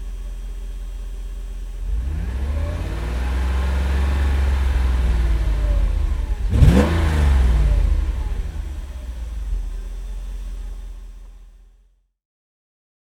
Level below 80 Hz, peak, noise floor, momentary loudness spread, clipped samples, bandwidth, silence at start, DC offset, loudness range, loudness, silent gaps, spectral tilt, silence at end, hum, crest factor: -22 dBFS; 0 dBFS; -57 dBFS; 16 LU; under 0.1%; 12 kHz; 0 s; under 0.1%; 15 LU; -22 LUFS; none; -7 dB/octave; 1.5 s; none; 20 dB